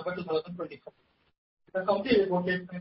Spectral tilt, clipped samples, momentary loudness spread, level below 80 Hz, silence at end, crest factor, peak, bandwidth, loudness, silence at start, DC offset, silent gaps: -10 dB/octave; under 0.1%; 15 LU; -62 dBFS; 0 s; 20 dB; -12 dBFS; 5.8 kHz; -29 LUFS; 0 s; under 0.1%; 1.38-1.57 s